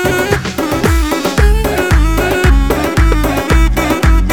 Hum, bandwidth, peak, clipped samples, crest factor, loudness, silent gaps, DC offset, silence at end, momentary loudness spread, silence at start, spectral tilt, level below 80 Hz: none; 18.5 kHz; 0 dBFS; under 0.1%; 10 dB; -13 LUFS; none; under 0.1%; 0 s; 3 LU; 0 s; -5.5 dB/octave; -14 dBFS